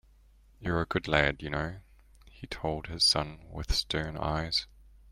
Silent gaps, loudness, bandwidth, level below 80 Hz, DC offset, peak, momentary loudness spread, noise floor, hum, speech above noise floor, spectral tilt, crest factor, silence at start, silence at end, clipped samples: none; -30 LUFS; 16 kHz; -42 dBFS; under 0.1%; -8 dBFS; 18 LU; -59 dBFS; none; 29 dB; -3.5 dB/octave; 24 dB; 0.6 s; 0.3 s; under 0.1%